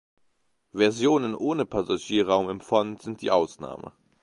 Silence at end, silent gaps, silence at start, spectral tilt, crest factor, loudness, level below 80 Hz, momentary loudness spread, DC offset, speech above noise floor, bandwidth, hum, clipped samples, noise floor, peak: 0.35 s; none; 0.75 s; -5 dB/octave; 20 dB; -25 LUFS; -60 dBFS; 16 LU; under 0.1%; 44 dB; 11 kHz; none; under 0.1%; -69 dBFS; -6 dBFS